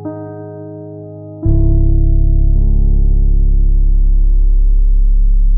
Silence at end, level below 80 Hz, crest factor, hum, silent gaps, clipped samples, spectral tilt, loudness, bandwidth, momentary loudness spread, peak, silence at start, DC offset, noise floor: 0 s; -10 dBFS; 8 dB; none; none; under 0.1%; -16 dB/octave; -15 LUFS; 1.3 kHz; 15 LU; -2 dBFS; 0 s; under 0.1%; -29 dBFS